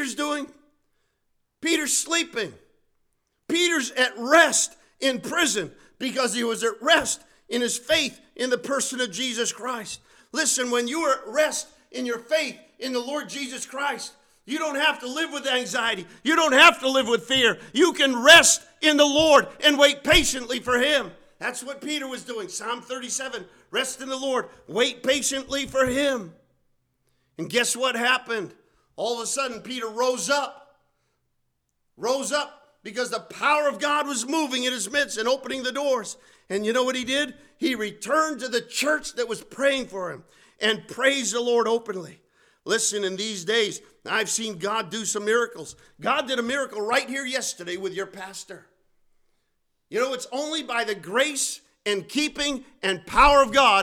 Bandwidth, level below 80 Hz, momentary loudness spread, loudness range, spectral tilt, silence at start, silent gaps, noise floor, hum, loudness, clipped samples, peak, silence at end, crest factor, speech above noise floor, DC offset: 19.5 kHz; -50 dBFS; 14 LU; 11 LU; -1.5 dB/octave; 0 s; none; -73 dBFS; none; -23 LUFS; under 0.1%; -4 dBFS; 0 s; 20 dB; 50 dB; under 0.1%